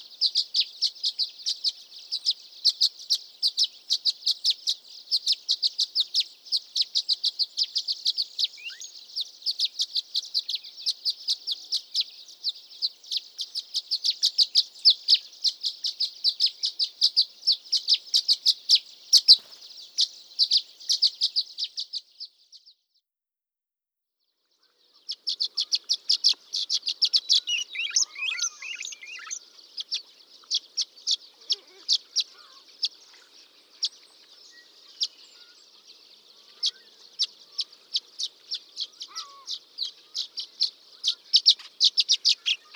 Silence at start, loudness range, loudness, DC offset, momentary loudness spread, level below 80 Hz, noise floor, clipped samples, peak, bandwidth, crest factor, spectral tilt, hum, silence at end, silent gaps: 0 s; 12 LU; -24 LUFS; under 0.1%; 13 LU; under -90 dBFS; under -90 dBFS; under 0.1%; -4 dBFS; over 20 kHz; 26 dB; 6 dB/octave; none; 0.2 s; none